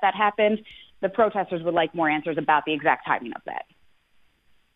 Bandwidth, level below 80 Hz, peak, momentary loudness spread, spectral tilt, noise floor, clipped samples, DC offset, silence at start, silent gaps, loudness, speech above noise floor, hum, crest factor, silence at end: 4.8 kHz; -66 dBFS; -6 dBFS; 11 LU; -8 dB/octave; -62 dBFS; under 0.1%; under 0.1%; 0 s; none; -24 LUFS; 38 dB; none; 20 dB; 1.15 s